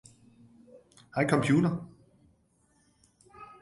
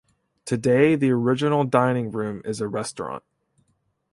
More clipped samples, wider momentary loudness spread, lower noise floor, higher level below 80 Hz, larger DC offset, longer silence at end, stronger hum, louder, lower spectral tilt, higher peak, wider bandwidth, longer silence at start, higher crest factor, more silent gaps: neither; first, 26 LU vs 15 LU; about the same, -68 dBFS vs -69 dBFS; about the same, -64 dBFS vs -62 dBFS; neither; second, 0.15 s vs 0.95 s; neither; second, -28 LUFS vs -22 LUFS; about the same, -7 dB/octave vs -6.5 dB/octave; second, -10 dBFS vs -4 dBFS; about the same, 11.5 kHz vs 11.5 kHz; first, 1.15 s vs 0.45 s; about the same, 22 dB vs 20 dB; neither